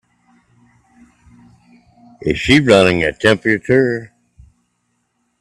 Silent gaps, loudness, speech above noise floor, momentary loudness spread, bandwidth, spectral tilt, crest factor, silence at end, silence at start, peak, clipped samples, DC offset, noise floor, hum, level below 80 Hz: none; -14 LUFS; 54 dB; 11 LU; 12.5 kHz; -5.5 dB/octave; 18 dB; 1.35 s; 2.2 s; 0 dBFS; under 0.1%; under 0.1%; -67 dBFS; 60 Hz at -45 dBFS; -44 dBFS